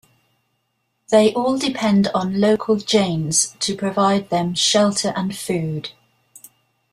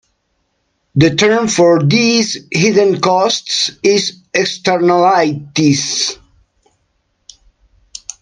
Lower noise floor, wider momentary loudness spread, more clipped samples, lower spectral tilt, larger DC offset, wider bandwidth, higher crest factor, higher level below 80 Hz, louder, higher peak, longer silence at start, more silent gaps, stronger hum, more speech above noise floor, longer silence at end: first, -71 dBFS vs -65 dBFS; about the same, 8 LU vs 7 LU; neither; about the same, -4 dB/octave vs -4 dB/octave; neither; first, 14.5 kHz vs 10.5 kHz; about the same, 18 dB vs 14 dB; second, -58 dBFS vs -52 dBFS; second, -18 LUFS vs -13 LUFS; about the same, -2 dBFS vs 0 dBFS; first, 1.1 s vs 0.95 s; neither; neither; about the same, 53 dB vs 53 dB; second, 1 s vs 2.05 s